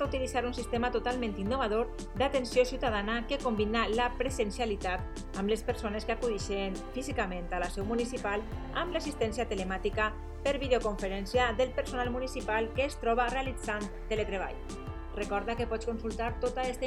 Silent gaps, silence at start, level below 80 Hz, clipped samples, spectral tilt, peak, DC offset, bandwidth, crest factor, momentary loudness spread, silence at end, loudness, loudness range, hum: none; 0 s; -42 dBFS; under 0.1%; -5 dB/octave; -14 dBFS; under 0.1%; 14.5 kHz; 18 dB; 7 LU; 0 s; -33 LUFS; 3 LU; none